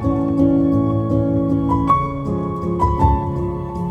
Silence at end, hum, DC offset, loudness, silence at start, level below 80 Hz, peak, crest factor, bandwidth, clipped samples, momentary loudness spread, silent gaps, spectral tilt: 0 s; none; under 0.1%; -18 LUFS; 0 s; -30 dBFS; -2 dBFS; 16 dB; 8.2 kHz; under 0.1%; 7 LU; none; -10 dB/octave